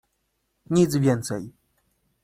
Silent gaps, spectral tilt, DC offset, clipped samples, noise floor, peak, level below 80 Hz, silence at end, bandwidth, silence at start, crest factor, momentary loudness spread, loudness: none; -6.5 dB/octave; under 0.1%; under 0.1%; -74 dBFS; -8 dBFS; -58 dBFS; 0.75 s; 15.5 kHz; 0.7 s; 18 dB; 14 LU; -23 LUFS